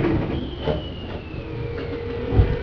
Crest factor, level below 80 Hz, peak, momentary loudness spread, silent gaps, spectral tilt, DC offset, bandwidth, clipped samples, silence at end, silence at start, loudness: 20 dB; -30 dBFS; -4 dBFS; 11 LU; none; -9.5 dB/octave; under 0.1%; 5.4 kHz; under 0.1%; 0 s; 0 s; -26 LUFS